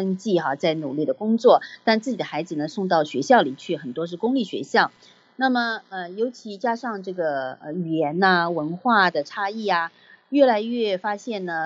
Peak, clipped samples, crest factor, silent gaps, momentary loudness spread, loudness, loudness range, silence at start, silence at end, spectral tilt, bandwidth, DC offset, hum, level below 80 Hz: -2 dBFS; under 0.1%; 20 dB; none; 10 LU; -23 LUFS; 4 LU; 0 s; 0 s; -5.5 dB/octave; 8 kHz; under 0.1%; none; -82 dBFS